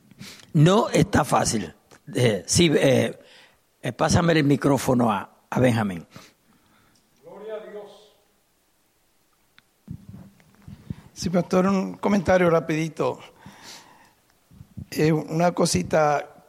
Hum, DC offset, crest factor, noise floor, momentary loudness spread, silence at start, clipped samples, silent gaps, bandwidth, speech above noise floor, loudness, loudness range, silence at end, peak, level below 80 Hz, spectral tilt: none; under 0.1%; 18 dB; -66 dBFS; 22 LU; 0.2 s; under 0.1%; none; 15.5 kHz; 45 dB; -22 LUFS; 22 LU; 0.2 s; -6 dBFS; -50 dBFS; -5.5 dB/octave